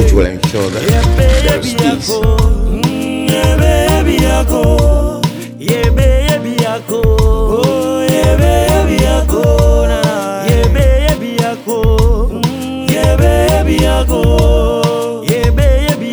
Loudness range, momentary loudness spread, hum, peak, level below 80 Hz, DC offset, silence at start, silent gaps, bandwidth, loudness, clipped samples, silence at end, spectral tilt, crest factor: 1 LU; 5 LU; none; 0 dBFS; -14 dBFS; under 0.1%; 0 s; none; over 20 kHz; -12 LUFS; under 0.1%; 0 s; -6 dB/octave; 10 dB